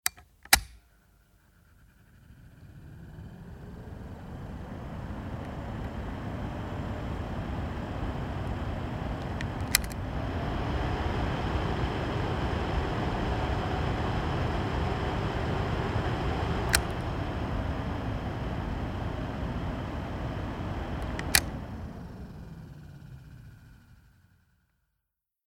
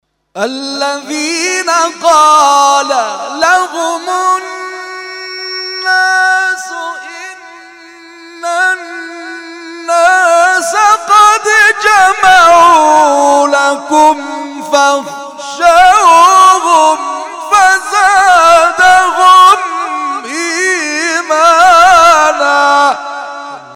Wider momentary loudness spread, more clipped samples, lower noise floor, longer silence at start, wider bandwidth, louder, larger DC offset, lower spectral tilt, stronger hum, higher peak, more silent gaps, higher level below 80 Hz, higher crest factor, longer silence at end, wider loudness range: about the same, 18 LU vs 18 LU; second, under 0.1% vs 0.4%; first, -84 dBFS vs -34 dBFS; second, 0.05 s vs 0.35 s; first, 19 kHz vs 16.5 kHz; second, -32 LUFS vs -8 LUFS; neither; first, -4.5 dB/octave vs -0.5 dB/octave; second, none vs 50 Hz at -65 dBFS; about the same, 0 dBFS vs 0 dBFS; neither; first, -40 dBFS vs -46 dBFS; first, 32 dB vs 8 dB; first, 1.5 s vs 0 s; first, 14 LU vs 8 LU